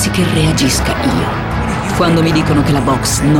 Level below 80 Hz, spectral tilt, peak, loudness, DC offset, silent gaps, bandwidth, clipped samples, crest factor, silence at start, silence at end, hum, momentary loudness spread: -26 dBFS; -5 dB/octave; -2 dBFS; -13 LUFS; under 0.1%; none; 17.5 kHz; under 0.1%; 12 dB; 0 s; 0 s; none; 5 LU